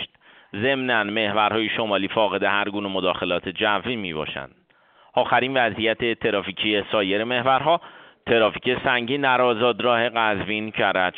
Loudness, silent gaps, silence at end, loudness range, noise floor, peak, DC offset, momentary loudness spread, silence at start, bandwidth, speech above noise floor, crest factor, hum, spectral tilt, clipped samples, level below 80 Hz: -22 LUFS; none; 0 s; 3 LU; -56 dBFS; -4 dBFS; under 0.1%; 7 LU; 0 s; 4.7 kHz; 35 dB; 18 dB; none; -2 dB/octave; under 0.1%; -58 dBFS